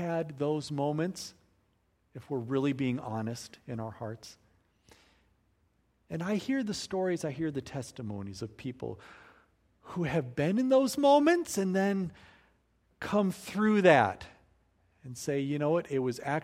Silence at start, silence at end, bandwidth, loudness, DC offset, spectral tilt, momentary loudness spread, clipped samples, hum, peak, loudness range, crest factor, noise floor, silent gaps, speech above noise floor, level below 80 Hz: 0 s; 0 s; 16 kHz; -30 LUFS; under 0.1%; -6 dB/octave; 18 LU; under 0.1%; none; -8 dBFS; 10 LU; 24 dB; -72 dBFS; none; 42 dB; -66 dBFS